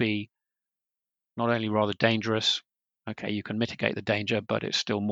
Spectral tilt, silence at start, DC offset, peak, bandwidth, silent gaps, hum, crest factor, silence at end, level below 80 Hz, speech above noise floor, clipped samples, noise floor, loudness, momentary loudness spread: -5 dB/octave; 0 s; under 0.1%; -6 dBFS; 8 kHz; none; none; 22 dB; 0 s; -70 dBFS; 62 dB; under 0.1%; -90 dBFS; -28 LUFS; 12 LU